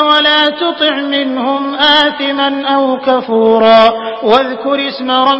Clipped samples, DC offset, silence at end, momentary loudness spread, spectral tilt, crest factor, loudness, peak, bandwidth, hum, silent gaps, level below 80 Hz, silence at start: 0.2%; under 0.1%; 0 s; 8 LU; -4.5 dB/octave; 10 dB; -11 LUFS; 0 dBFS; 8 kHz; none; none; -54 dBFS; 0 s